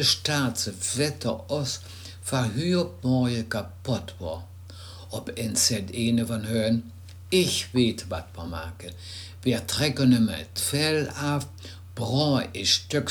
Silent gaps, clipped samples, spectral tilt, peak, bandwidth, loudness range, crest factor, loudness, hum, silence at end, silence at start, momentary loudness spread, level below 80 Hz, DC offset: none; under 0.1%; -4 dB/octave; -8 dBFS; over 20 kHz; 3 LU; 18 dB; -26 LUFS; none; 0 s; 0 s; 16 LU; -52 dBFS; under 0.1%